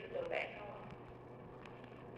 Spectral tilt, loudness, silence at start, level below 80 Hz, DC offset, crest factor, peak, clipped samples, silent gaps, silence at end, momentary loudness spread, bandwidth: -6.5 dB/octave; -47 LUFS; 0 s; -70 dBFS; under 0.1%; 22 dB; -26 dBFS; under 0.1%; none; 0 s; 13 LU; 10.5 kHz